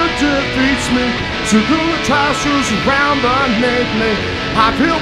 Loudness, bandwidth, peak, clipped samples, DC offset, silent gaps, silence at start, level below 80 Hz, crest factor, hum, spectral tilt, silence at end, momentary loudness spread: -14 LUFS; 14.5 kHz; 0 dBFS; under 0.1%; under 0.1%; none; 0 s; -32 dBFS; 14 dB; none; -4 dB/octave; 0 s; 3 LU